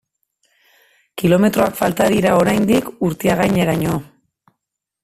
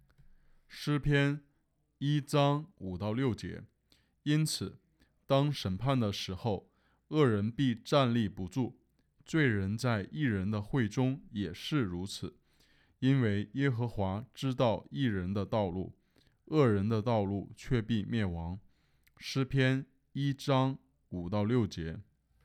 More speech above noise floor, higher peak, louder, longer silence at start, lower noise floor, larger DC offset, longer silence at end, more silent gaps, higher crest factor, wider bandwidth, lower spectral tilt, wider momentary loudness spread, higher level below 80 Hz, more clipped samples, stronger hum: first, 64 dB vs 44 dB; first, -2 dBFS vs -14 dBFS; first, -16 LUFS vs -33 LUFS; first, 1.15 s vs 0.7 s; first, -80 dBFS vs -75 dBFS; neither; first, 1 s vs 0.45 s; neither; about the same, 16 dB vs 20 dB; about the same, 15.5 kHz vs 14.5 kHz; about the same, -6 dB/octave vs -6.5 dB/octave; second, 8 LU vs 12 LU; first, -46 dBFS vs -58 dBFS; neither; neither